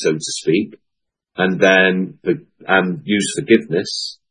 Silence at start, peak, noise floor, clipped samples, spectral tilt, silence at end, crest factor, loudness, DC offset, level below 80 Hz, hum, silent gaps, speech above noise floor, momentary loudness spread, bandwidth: 0 s; 0 dBFS; -78 dBFS; under 0.1%; -4.5 dB/octave; 0.15 s; 18 dB; -17 LUFS; under 0.1%; -64 dBFS; none; none; 61 dB; 11 LU; 10 kHz